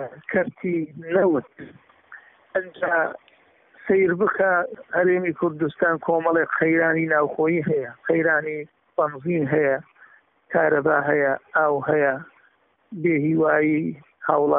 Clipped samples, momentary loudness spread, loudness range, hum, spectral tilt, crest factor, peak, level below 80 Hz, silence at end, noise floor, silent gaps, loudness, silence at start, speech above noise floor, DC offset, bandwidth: under 0.1%; 9 LU; 4 LU; none; -1.5 dB/octave; 18 dB; -4 dBFS; -66 dBFS; 0 s; -62 dBFS; none; -22 LUFS; 0 s; 40 dB; under 0.1%; 3.9 kHz